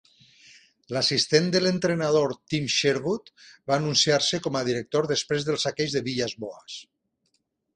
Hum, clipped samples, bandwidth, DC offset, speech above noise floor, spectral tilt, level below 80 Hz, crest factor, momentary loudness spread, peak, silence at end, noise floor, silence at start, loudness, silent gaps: none; under 0.1%; 10 kHz; under 0.1%; 49 dB; -4 dB/octave; -64 dBFS; 20 dB; 12 LU; -6 dBFS; 0.95 s; -74 dBFS; 0.9 s; -24 LUFS; none